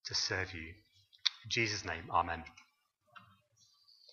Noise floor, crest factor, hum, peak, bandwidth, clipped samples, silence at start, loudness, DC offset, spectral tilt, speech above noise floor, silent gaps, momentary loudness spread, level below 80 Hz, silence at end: -73 dBFS; 30 dB; none; -10 dBFS; 7.4 kHz; under 0.1%; 0.05 s; -36 LUFS; under 0.1%; -2.5 dB/octave; 36 dB; none; 13 LU; -64 dBFS; 0.9 s